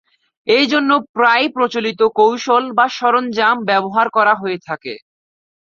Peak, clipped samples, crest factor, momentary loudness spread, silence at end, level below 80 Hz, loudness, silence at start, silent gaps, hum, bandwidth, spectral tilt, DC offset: 0 dBFS; under 0.1%; 16 dB; 11 LU; 0.7 s; -64 dBFS; -15 LUFS; 0.45 s; 1.09-1.14 s; none; 7.2 kHz; -4 dB/octave; under 0.1%